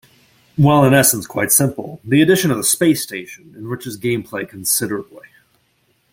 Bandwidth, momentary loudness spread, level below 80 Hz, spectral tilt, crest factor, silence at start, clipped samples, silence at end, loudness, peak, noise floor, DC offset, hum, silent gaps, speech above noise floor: 17 kHz; 17 LU; -54 dBFS; -4.5 dB/octave; 18 dB; 0.6 s; under 0.1%; 0.95 s; -15 LUFS; 0 dBFS; -62 dBFS; under 0.1%; none; none; 45 dB